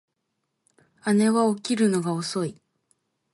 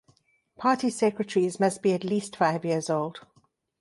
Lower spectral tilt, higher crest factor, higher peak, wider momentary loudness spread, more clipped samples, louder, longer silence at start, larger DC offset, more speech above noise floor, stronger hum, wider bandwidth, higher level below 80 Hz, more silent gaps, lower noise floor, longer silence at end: about the same, -5.5 dB/octave vs -5.5 dB/octave; about the same, 16 dB vs 18 dB; about the same, -10 dBFS vs -8 dBFS; first, 10 LU vs 5 LU; neither; about the same, -24 LUFS vs -26 LUFS; first, 1.05 s vs 0.6 s; neither; first, 56 dB vs 40 dB; neither; about the same, 11.5 kHz vs 11.5 kHz; about the same, -72 dBFS vs -72 dBFS; neither; first, -78 dBFS vs -66 dBFS; first, 0.8 s vs 0.6 s